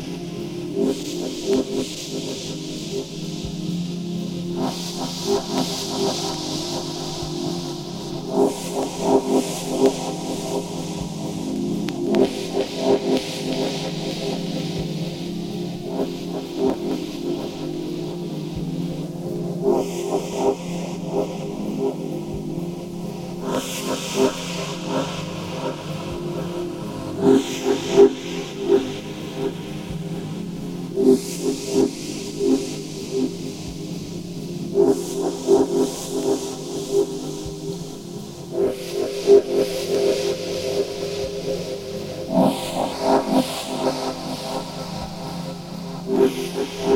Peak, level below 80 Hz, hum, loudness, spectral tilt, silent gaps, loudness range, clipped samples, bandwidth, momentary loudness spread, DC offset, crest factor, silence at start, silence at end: -2 dBFS; -50 dBFS; none; -24 LUFS; -5 dB/octave; none; 5 LU; under 0.1%; 17 kHz; 11 LU; under 0.1%; 20 dB; 0 s; 0 s